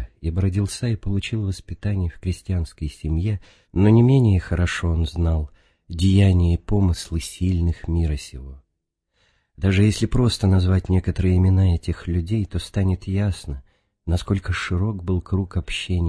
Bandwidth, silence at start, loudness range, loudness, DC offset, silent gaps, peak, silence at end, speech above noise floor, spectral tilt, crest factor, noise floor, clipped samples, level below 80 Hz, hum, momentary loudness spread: 11 kHz; 0 s; 5 LU; -22 LUFS; under 0.1%; none; -4 dBFS; 0 s; 57 dB; -7 dB/octave; 18 dB; -77 dBFS; under 0.1%; -32 dBFS; none; 12 LU